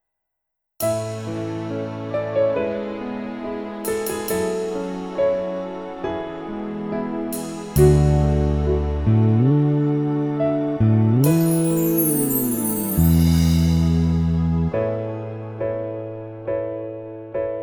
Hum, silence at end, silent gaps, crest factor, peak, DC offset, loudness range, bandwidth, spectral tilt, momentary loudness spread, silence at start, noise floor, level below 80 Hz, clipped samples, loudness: none; 0 s; none; 18 dB; -2 dBFS; under 0.1%; 7 LU; over 20 kHz; -7 dB/octave; 12 LU; 0.8 s; -80 dBFS; -32 dBFS; under 0.1%; -21 LUFS